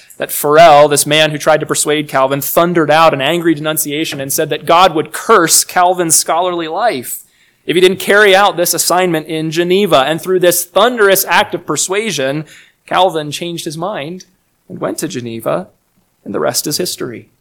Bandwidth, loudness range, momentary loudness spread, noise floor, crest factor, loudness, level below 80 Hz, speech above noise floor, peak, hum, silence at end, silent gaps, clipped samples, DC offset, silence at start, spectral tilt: over 20 kHz; 9 LU; 13 LU; -57 dBFS; 12 dB; -12 LUFS; -54 dBFS; 45 dB; 0 dBFS; none; 0.2 s; none; 1%; under 0.1%; 0.2 s; -3 dB/octave